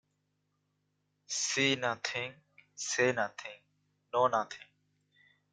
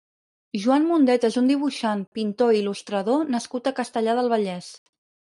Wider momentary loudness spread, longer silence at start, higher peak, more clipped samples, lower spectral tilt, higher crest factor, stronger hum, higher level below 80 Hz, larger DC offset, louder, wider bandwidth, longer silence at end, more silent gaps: first, 14 LU vs 9 LU; first, 1.3 s vs 0.55 s; second, -14 dBFS vs -8 dBFS; neither; second, -2.5 dB/octave vs -5.5 dB/octave; first, 22 dB vs 14 dB; first, 50 Hz at -80 dBFS vs none; about the same, -78 dBFS vs -74 dBFS; neither; second, -32 LUFS vs -23 LUFS; about the same, 10.5 kHz vs 11.5 kHz; first, 0.9 s vs 0.5 s; second, none vs 2.07-2.12 s